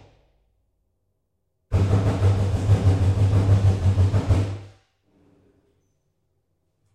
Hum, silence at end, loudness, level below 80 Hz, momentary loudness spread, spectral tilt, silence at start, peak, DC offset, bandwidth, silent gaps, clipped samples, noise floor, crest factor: none; 2.25 s; -21 LUFS; -38 dBFS; 5 LU; -8 dB/octave; 1.7 s; -8 dBFS; under 0.1%; 8.8 kHz; none; under 0.1%; -74 dBFS; 14 dB